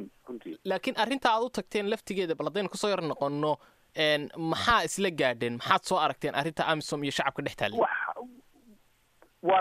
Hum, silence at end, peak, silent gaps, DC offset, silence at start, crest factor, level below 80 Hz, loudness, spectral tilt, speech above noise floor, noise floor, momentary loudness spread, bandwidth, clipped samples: none; 0 s; -8 dBFS; none; under 0.1%; 0 s; 22 dB; -60 dBFS; -29 LUFS; -4 dB/octave; 35 dB; -63 dBFS; 10 LU; 15 kHz; under 0.1%